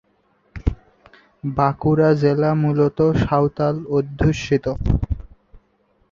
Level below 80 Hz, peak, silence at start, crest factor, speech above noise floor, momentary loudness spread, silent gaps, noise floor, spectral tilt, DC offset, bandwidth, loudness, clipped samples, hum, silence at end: -32 dBFS; -2 dBFS; 0.55 s; 18 dB; 44 dB; 11 LU; none; -62 dBFS; -8 dB/octave; under 0.1%; 7.4 kHz; -19 LUFS; under 0.1%; none; 0.55 s